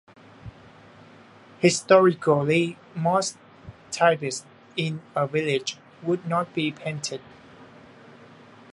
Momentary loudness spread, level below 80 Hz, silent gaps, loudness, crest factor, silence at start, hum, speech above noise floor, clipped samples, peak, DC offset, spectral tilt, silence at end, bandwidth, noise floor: 18 LU; -64 dBFS; none; -24 LUFS; 24 dB; 0.45 s; none; 27 dB; under 0.1%; -2 dBFS; under 0.1%; -5 dB/octave; 1.1 s; 11.5 kHz; -50 dBFS